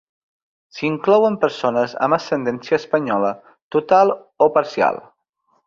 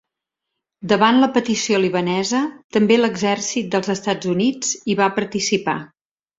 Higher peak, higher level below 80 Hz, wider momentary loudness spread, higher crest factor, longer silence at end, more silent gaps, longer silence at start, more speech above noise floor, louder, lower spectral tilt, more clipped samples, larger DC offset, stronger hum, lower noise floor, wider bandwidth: about the same, -2 dBFS vs -2 dBFS; about the same, -64 dBFS vs -60 dBFS; about the same, 9 LU vs 7 LU; about the same, 18 dB vs 18 dB; about the same, 0.65 s vs 0.55 s; about the same, 3.62-3.71 s vs 2.64-2.70 s; about the same, 0.75 s vs 0.8 s; second, 48 dB vs 63 dB; about the same, -18 LUFS vs -19 LUFS; first, -6 dB/octave vs -4 dB/octave; neither; neither; neither; second, -66 dBFS vs -82 dBFS; about the same, 7.4 kHz vs 7.8 kHz